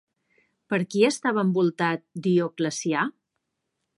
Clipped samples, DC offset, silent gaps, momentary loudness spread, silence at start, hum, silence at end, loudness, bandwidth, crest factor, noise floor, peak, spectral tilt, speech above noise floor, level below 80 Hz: under 0.1%; under 0.1%; none; 7 LU; 0.7 s; none; 0.85 s; -25 LUFS; 11.5 kHz; 18 dB; -80 dBFS; -8 dBFS; -5.5 dB/octave; 56 dB; -76 dBFS